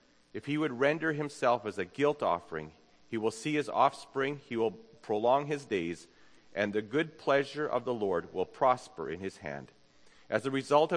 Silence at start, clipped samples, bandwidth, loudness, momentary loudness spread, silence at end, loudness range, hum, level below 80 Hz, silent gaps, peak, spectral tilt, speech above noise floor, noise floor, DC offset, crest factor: 0.35 s; under 0.1%; 10.5 kHz; -32 LUFS; 14 LU; 0 s; 1 LU; none; -72 dBFS; none; -12 dBFS; -5.5 dB/octave; 28 dB; -59 dBFS; under 0.1%; 20 dB